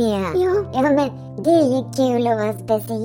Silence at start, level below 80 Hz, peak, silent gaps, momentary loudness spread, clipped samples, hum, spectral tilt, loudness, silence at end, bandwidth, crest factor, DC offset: 0 s; -50 dBFS; -6 dBFS; none; 6 LU; under 0.1%; none; -6.5 dB/octave; -19 LUFS; 0 s; 17 kHz; 14 dB; under 0.1%